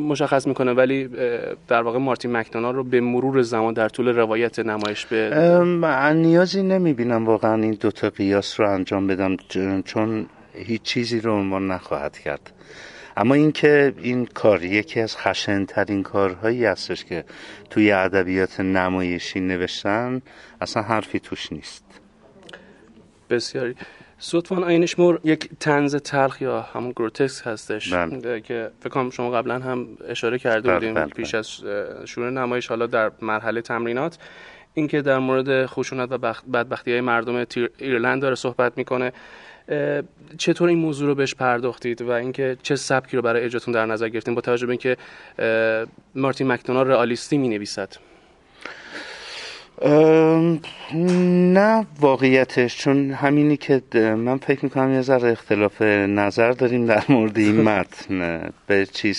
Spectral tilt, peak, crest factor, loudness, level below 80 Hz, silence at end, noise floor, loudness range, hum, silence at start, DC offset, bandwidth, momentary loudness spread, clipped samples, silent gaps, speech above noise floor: -6 dB/octave; -2 dBFS; 20 dB; -21 LUFS; -54 dBFS; 0 s; -52 dBFS; 7 LU; none; 0 s; under 0.1%; 11.5 kHz; 12 LU; under 0.1%; none; 31 dB